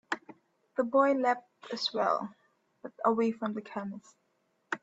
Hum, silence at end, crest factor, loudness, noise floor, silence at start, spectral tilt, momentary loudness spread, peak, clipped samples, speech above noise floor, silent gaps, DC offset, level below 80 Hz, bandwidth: none; 0.05 s; 20 dB; -31 LUFS; -75 dBFS; 0.1 s; -5 dB/octave; 17 LU; -12 dBFS; under 0.1%; 45 dB; none; under 0.1%; -82 dBFS; 8 kHz